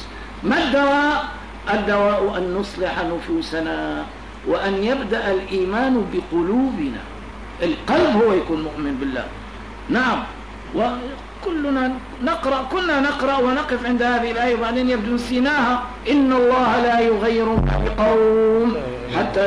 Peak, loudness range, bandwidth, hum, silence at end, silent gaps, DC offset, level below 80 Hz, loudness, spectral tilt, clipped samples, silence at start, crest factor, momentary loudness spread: -6 dBFS; 5 LU; 11 kHz; none; 0 s; none; 0.3%; -36 dBFS; -20 LUFS; -6 dB/octave; under 0.1%; 0 s; 14 dB; 12 LU